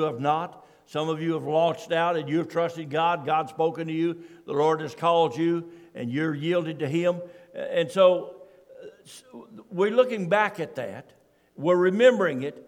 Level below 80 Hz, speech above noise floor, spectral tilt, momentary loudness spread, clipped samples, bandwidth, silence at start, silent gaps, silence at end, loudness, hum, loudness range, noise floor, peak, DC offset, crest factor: -76 dBFS; 23 dB; -6.5 dB/octave; 16 LU; under 0.1%; 12 kHz; 0 s; none; 0.05 s; -25 LUFS; none; 3 LU; -48 dBFS; -6 dBFS; under 0.1%; 20 dB